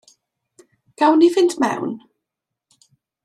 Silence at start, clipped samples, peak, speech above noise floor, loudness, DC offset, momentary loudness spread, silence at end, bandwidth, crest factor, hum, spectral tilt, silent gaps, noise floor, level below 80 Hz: 1 s; under 0.1%; -4 dBFS; 67 dB; -17 LUFS; under 0.1%; 15 LU; 1.25 s; 12.5 kHz; 18 dB; none; -4.5 dB/octave; none; -83 dBFS; -72 dBFS